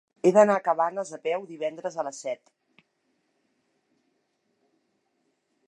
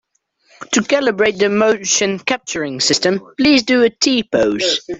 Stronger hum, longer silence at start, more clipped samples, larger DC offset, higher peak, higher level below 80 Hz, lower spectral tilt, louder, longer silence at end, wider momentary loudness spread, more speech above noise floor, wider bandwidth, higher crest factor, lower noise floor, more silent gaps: neither; second, 0.25 s vs 0.6 s; neither; neither; second, -6 dBFS vs -2 dBFS; second, -84 dBFS vs -52 dBFS; first, -5.5 dB/octave vs -2.5 dB/octave; second, -25 LUFS vs -15 LUFS; first, 3.35 s vs 0 s; first, 15 LU vs 6 LU; first, 49 dB vs 42 dB; first, 10.5 kHz vs 8.4 kHz; first, 24 dB vs 14 dB; first, -74 dBFS vs -58 dBFS; neither